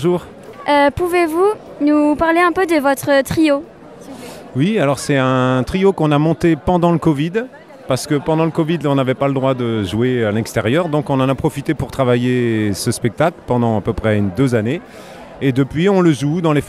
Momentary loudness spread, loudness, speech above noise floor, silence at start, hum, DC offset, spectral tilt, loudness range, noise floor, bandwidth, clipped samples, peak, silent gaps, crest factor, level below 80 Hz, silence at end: 8 LU; -16 LUFS; 20 dB; 0 s; none; under 0.1%; -6.5 dB/octave; 2 LU; -35 dBFS; 15.5 kHz; under 0.1%; 0 dBFS; none; 16 dB; -42 dBFS; 0 s